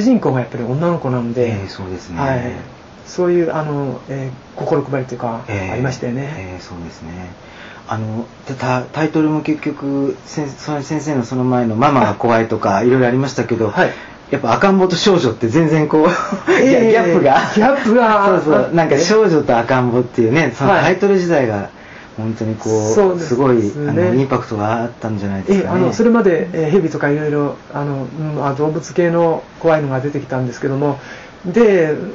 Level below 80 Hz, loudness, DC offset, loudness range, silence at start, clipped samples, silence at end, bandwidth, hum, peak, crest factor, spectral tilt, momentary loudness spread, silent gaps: -48 dBFS; -15 LUFS; under 0.1%; 9 LU; 0 s; under 0.1%; 0 s; 7.8 kHz; none; -2 dBFS; 14 dB; -6 dB/octave; 14 LU; none